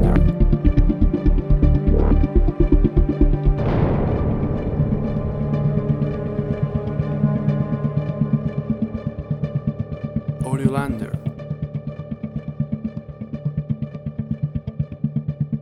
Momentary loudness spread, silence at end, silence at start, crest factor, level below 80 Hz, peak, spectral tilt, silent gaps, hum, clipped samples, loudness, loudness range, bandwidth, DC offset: 11 LU; 0 s; 0 s; 16 dB; -24 dBFS; -4 dBFS; -10 dB/octave; none; none; under 0.1%; -22 LUFS; 9 LU; 9.6 kHz; under 0.1%